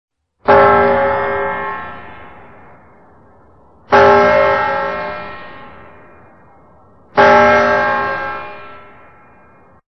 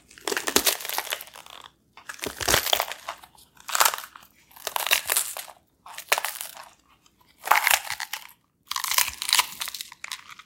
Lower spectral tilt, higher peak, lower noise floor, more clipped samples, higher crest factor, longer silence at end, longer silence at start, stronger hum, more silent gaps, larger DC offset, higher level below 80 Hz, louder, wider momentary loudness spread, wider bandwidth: first, -6 dB/octave vs 0.5 dB/octave; about the same, 0 dBFS vs 0 dBFS; second, -47 dBFS vs -60 dBFS; neither; second, 16 dB vs 28 dB; first, 1.1 s vs 0.1 s; first, 0.45 s vs 0.25 s; neither; neither; first, 0.9% vs under 0.1%; first, -42 dBFS vs -56 dBFS; first, -12 LUFS vs -24 LUFS; about the same, 22 LU vs 21 LU; second, 6.4 kHz vs 17 kHz